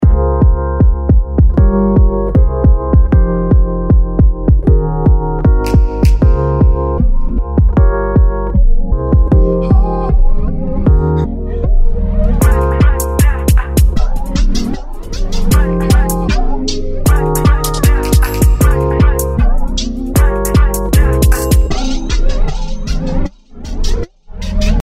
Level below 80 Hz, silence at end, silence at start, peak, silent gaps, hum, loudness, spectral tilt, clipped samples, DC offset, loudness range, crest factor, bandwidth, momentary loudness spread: -12 dBFS; 0 s; 0 s; 0 dBFS; none; none; -13 LUFS; -6.5 dB/octave; under 0.1%; under 0.1%; 3 LU; 10 dB; 16 kHz; 8 LU